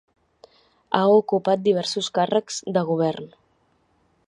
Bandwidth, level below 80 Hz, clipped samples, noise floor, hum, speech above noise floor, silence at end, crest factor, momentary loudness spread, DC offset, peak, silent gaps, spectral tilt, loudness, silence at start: 11 kHz; -70 dBFS; under 0.1%; -65 dBFS; none; 44 dB; 1 s; 22 dB; 8 LU; under 0.1%; -2 dBFS; none; -5 dB/octave; -22 LUFS; 0.9 s